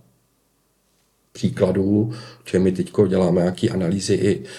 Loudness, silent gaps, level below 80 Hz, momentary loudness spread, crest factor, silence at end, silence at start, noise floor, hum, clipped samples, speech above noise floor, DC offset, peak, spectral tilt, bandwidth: -20 LUFS; none; -56 dBFS; 8 LU; 18 dB; 0 s; 1.35 s; -65 dBFS; none; under 0.1%; 45 dB; under 0.1%; -4 dBFS; -7 dB/octave; 12 kHz